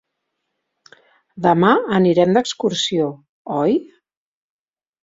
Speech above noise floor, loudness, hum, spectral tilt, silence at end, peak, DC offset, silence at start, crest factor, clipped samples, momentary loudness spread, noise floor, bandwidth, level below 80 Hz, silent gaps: 59 dB; -17 LUFS; none; -5.5 dB/octave; 1.2 s; -2 dBFS; under 0.1%; 1.35 s; 18 dB; under 0.1%; 9 LU; -76 dBFS; 7.8 kHz; -60 dBFS; 3.29-3.45 s